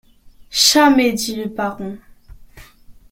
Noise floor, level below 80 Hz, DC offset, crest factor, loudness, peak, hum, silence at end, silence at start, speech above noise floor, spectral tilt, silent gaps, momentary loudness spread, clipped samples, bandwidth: -45 dBFS; -46 dBFS; under 0.1%; 18 dB; -15 LUFS; 0 dBFS; none; 0.2 s; 0.5 s; 29 dB; -2 dB/octave; none; 16 LU; under 0.1%; 16.5 kHz